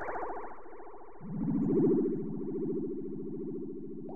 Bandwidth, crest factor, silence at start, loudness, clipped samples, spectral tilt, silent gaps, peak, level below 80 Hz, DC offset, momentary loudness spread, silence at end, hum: 2.6 kHz; 16 dB; 0 s; -34 LUFS; under 0.1%; -12.5 dB/octave; none; -18 dBFS; -58 dBFS; 0.7%; 21 LU; 0 s; none